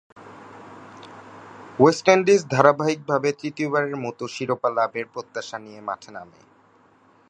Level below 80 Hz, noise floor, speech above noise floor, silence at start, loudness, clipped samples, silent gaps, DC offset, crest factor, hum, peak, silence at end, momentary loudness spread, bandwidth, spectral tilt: -68 dBFS; -57 dBFS; 35 dB; 0.15 s; -22 LUFS; under 0.1%; none; under 0.1%; 22 dB; none; 0 dBFS; 1.05 s; 25 LU; 9.8 kHz; -5.5 dB/octave